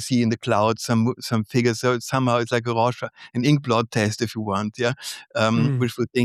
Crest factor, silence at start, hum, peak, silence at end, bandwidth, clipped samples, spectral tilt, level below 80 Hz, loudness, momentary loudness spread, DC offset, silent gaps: 16 dB; 0 s; none; -6 dBFS; 0 s; 14 kHz; under 0.1%; -5.5 dB/octave; -64 dBFS; -22 LUFS; 5 LU; under 0.1%; none